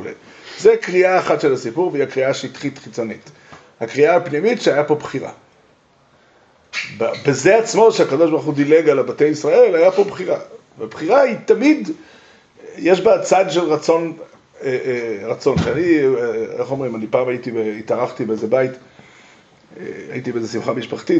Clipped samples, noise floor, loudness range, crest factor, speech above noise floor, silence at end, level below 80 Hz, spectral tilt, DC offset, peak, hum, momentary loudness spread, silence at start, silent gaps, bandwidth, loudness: under 0.1%; -54 dBFS; 7 LU; 16 dB; 38 dB; 0 s; -56 dBFS; -5.5 dB/octave; under 0.1%; -2 dBFS; none; 14 LU; 0 s; none; 8.2 kHz; -17 LUFS